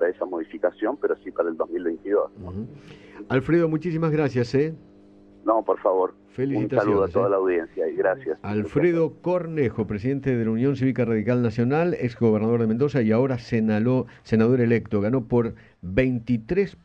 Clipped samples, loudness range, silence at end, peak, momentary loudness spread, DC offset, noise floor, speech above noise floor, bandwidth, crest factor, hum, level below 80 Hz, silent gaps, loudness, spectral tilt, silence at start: under 0.1%; 3 LU; 0.15 s; -8 dBFS; 7 LU; under 0.1%; -50 dBFS; 28 dB; 7.8 kHz; 16 dB; none; -52 dBFS; none; -23 LUFS; -9 dB/octave; 0 s